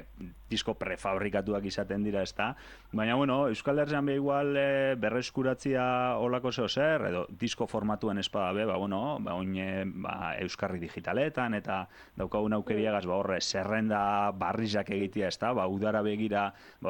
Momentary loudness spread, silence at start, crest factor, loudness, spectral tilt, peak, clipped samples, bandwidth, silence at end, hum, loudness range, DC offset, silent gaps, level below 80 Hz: 7 LU; 0 s; 16 dB; -31 LUFS; -5.5 dB/octave; -14 dBFS; under 0.1%; 17 kHz; 0 s; none; 4 LU; under 0.1%; none; -58 dBFS